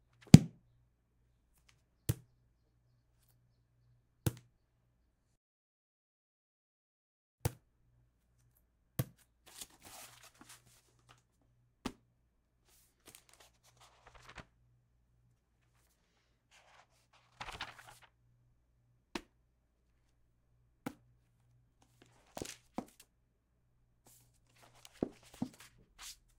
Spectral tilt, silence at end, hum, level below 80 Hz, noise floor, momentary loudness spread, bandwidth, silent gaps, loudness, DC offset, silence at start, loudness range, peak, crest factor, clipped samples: -6.5 dB/octave; 0.9 s; none; -62 dBFS; -76 dBFS; 16 LU; 16 kHz; 5.37-7.38 s; -34 LUFS; under 0.1%; 0.35 s; 14 LU; -2 dBFS; 40 dB; under 0.1%